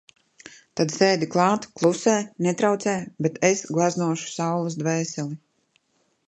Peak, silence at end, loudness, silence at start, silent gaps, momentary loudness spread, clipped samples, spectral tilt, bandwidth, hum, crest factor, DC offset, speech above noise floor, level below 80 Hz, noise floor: -4 dBFS; 0.9 s; -23 LUFS; 0.45 s; none; 8 LU; under 0.1%; -5 dB/octave; 11 kHz; none; 20 dB; under 0.1%; 45 dB; -70 dBFS; -68 dBFS